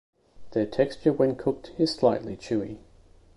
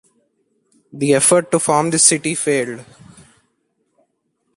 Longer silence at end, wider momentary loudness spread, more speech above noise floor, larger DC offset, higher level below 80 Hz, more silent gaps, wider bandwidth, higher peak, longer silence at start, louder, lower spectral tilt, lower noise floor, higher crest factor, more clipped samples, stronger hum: second, 0.6 s vs 1.75 s; about the same, 9 LU vs 11 LU; second, 29 dB vs 53 dB; neither; first, -56 dBFS vs -62 dBFS; neither; second, 11.5 kHz vs 13 kHz; second, -8 dBFS vs 0 dBFS; second, 0.4 s vs 0.95 s; second, -26 LUFS vs -15 LUFS; first, -6.5 dB/octave vs -3 dB/octave; second, -55 dBFS vs -69 dBFS; about the same, 20 dB vs 20 dB; neither; neither